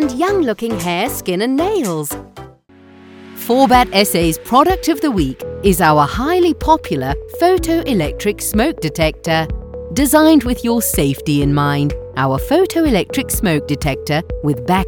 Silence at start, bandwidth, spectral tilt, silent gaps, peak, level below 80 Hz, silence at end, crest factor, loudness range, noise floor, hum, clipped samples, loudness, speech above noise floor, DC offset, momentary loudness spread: 0 s; 19.5 kHz; -5 dB/octave; none; 0 dBFS; -30 dBFS; 0 s; 16 dB; 3 LU; -44 dBFS; none; under 0.1%; -15 LUFS; 29 dB; under 0.1%; 9 LU